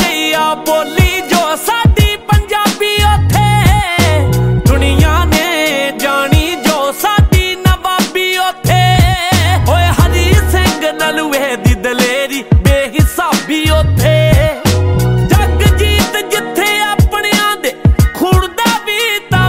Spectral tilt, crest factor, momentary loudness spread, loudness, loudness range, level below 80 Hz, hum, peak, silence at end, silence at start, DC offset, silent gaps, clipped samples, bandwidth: -5 dB/octave; 10 dB; 4 LU; -11 LUFS; 1 LU; -18 dBFS; none; 0 dBFS; 0 s; 0 s; under 0.1%; none; under 0.1%; 16.5 kHz